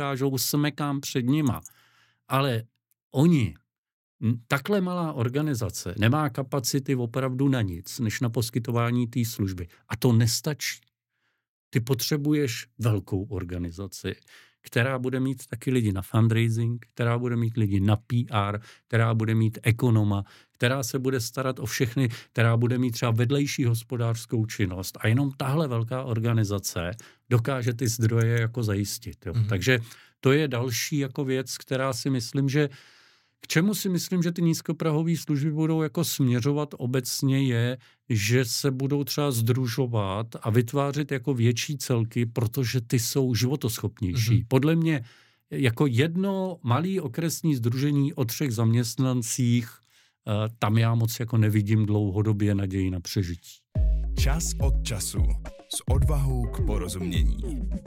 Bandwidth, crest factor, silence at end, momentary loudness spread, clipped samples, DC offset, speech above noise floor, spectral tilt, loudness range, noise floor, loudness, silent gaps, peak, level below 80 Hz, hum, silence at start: 17 kHz; 22 dB; 0 s; 7 LU; under 0.1%; under 0.1%; 52 dB; -5.5 dB/octave; 2 LU; -77 dBFS; -26 LUFS; 3.03-3.10 s, 3.78-3.83 s, 3.93-4.19 s, 11.49-11.71 s; -4 dBFS; -38 dBFS; none; 0 s